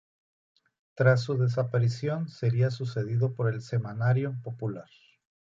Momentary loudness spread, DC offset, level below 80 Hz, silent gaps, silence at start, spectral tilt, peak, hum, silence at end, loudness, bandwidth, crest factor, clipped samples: 11 LU; under 0.1%; -66 dBFS; none; 0.95 s; -8 dB/octave; -8 dBFS; none; 0.75 s; -28 LUFS; 7.6 kHz; 20 dB; under 0.1%